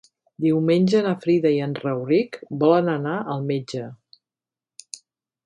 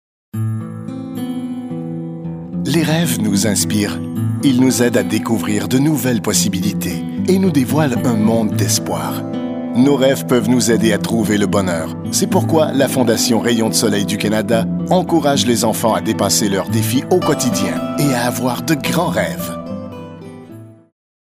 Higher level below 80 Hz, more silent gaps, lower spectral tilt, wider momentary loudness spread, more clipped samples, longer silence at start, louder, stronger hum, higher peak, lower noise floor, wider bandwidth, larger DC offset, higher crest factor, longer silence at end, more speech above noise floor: second, -68 dBFS vs -50 dBFS; neither; first, -7 dB/octave vs -5 dB/octave; first, 20 LU vs 11 LU; neither; about the same, 0.4 s vs 0.35 s; second, -22 LUFS vs -16 LUFS; neither; second, -6 dBFS vs 0 dBFS; first, under -90 dBFS vs -37 dBFS; second, 11 kHz vs 16 kHz; neither; about the same, 18 dB vs 16 dB; first, 1.5 s vs 0.5 s; first, over 69 dB vs 22 dB